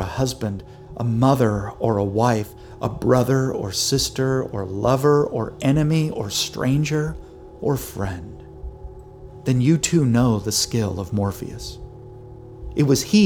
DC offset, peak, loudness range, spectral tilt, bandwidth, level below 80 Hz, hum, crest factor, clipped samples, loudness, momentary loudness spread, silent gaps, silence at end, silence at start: under 0.1%; -2 dBFS; 4 LU; -5.5 dB/octave; over 20 kHz; -42 dBFS; none; 18 dB; under 0.1%; -21 LUFS; 21 LU; none; 0 s; 0 s